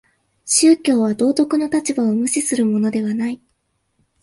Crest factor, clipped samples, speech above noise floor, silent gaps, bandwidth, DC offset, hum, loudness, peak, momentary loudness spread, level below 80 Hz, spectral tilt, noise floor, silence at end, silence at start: 16 dB; under 0.1%; 51 dB; none; 11.5 kHz; under 0.1%; none; -17 LUFS; -2 dBFS; 10 LU; -64 dBFS; -4 dB/octave; -68 dBFS; 0.9 s; 0.45 s